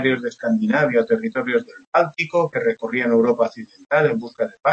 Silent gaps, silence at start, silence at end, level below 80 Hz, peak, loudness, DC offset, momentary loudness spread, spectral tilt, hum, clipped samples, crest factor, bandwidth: 1.87-1.92 s; 0 s; 0 s; -68 dBFS; -4 dBFS; -20 LUFS; under 0.1%; 6 LU; -7 dB/octave; none; under 0.1%; 16 dB; 8 kHz